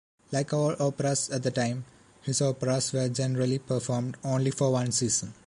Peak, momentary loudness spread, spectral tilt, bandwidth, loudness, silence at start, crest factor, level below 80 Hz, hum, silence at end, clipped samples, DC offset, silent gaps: -12 dBFS; 5 LU; -5 dB/octave; 11.5 kHz; -28 LUFS; 0.3 s; 16 dB; -64 dBFS; none; 0.15 s; under 0.1%; under 0.1%; none